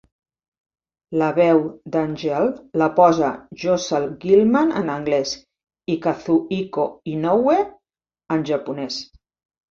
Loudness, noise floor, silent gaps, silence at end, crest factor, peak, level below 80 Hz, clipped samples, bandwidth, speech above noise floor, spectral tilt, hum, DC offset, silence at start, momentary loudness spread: -20 LUFS; -86 dBFS; none; 0.7 s; 18 dB; -2 dBFS; -58 dBFS; under 0.1%; 7.4 kHz; 67 dB; -6 dB/octave; none; under 0.1%; 1.1 s; 12 LU